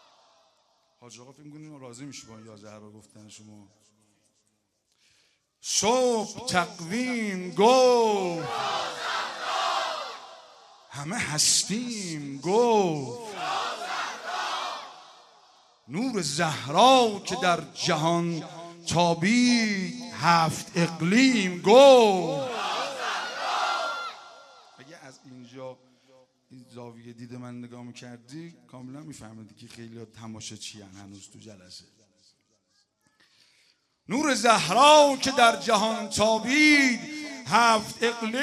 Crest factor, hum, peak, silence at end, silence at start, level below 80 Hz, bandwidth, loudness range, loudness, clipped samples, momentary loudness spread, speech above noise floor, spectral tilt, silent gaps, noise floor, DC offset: 22 dB; none; -4 dBFS; 0 s; 1.05 s; -68 dBFS; 13.5 kHz; 23 LU; -23 LUFS; under 0.1%; 25 LU; 49 dB; -3.5 dB/octave; none; -74 dBFS; under 0.1%